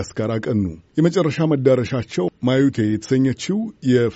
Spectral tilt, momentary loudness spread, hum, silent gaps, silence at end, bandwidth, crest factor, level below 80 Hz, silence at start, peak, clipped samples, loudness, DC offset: -7 dB/octave; 6 LU; none; none; 0 s; 8 kHz; 16 dB; -50 dBFS; 0 s; -4 dBFS; under 0.1%; -20 LUFS; under 0.1%